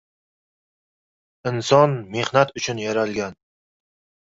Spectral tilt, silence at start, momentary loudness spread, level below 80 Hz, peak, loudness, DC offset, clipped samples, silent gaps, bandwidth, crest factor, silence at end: -5 dB/octave; 1.45 s; 12 LU; -60 dBFS; -2 dBFS; -21 LUFS; under 0.1%; under 0.1%; none; 7.8 kHz; 22 dB; 0.9 s